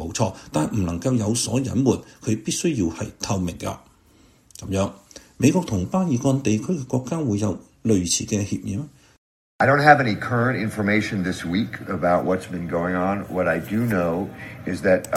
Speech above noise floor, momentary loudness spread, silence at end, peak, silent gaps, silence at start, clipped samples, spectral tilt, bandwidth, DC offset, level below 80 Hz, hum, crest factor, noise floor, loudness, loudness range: 33 dB; 8 LU; 0 s; 0 dBFS; 9.18-9.59 s; 0 s; under 0.1%; -5 dB/octave; 16 kHz; under 0.1%; -50 dBFS; none; 22 dB; -55 dBFS; -22 LUFS; 5 LU